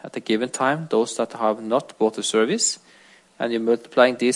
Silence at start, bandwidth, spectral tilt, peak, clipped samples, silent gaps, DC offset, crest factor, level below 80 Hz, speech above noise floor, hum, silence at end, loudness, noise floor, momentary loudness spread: 0.05 s; 11.5 kHz; -3 dB/octave; -2 dBFS; under 0.1%; none; under 0.1%; 20 dB; -76 dBFS; 31 dB; none; 0 s; -22 LUFS; -52 dBFS; 7 LU